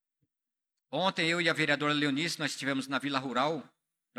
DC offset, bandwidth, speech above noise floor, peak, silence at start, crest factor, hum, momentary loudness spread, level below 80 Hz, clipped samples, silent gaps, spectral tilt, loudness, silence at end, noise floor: under 0.1%; 14 kHz; 56 dB; -12 dBFS; 0.9 s; 20 dB; none; 6 LU; -88 dBFS; under 0.1%; none; -4 dB/octave; -30 LUFS; 0.55 s; -86 dBFS